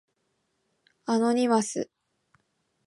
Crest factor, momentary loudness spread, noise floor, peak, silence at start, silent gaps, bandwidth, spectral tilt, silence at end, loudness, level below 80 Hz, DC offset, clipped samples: 18 dB; 16 LU; -76 dBFS; -12 dBFS; 1.1 s; none; 11.5 kHz; -4.5 dB/octave; 1.05 s; -26 LUFS; -78 dBFS; under 0.1%; under 0.1%